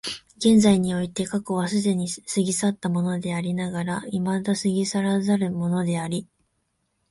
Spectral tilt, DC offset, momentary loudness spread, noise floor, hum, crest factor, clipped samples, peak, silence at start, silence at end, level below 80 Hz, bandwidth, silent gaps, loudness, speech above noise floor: -5.5 dB/octave; under 0.1%; 8 LU; -73 dBFS; none; 18 dB; under 0.1%; -6 dBFS; 0.05 s; 0.85 s; -58 dBFS; 11.5 kHz; none; -24 LUFS; 50 dB